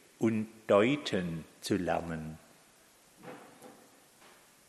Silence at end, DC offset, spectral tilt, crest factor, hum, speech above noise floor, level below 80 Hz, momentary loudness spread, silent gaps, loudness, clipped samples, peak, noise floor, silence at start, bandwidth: 0.95 s; under 0.1%; -6 dB/octave; 22 dB; none; 31 dB; -64 dBFS; 26 LU; none; -32 LUFS; under 0.1%; -12 dBFS; -62 dBFS; 0.2 s; 13 kHz